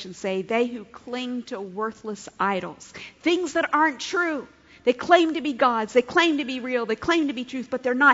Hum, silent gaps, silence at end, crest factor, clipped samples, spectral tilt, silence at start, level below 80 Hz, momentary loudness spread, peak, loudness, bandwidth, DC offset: none; none; 0 s; 20 dB; under 0.1%; -4 dB/octave; 0 s; -62 dBFS; 15 LU; -2 dBFS; -24 LUFS; 8 kHz; under 0.1%